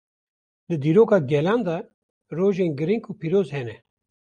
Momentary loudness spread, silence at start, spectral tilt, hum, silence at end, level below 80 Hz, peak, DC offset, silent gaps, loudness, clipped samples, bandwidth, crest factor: 14 LU; 0.7 s; -8.5 dB/octave; none; 0.45 s; -66 dBFS; -6 dBFS; under 0.1%; 1.94-2.21 s; -22 LUFS; under 0.1%; 9 kHz; 18 dB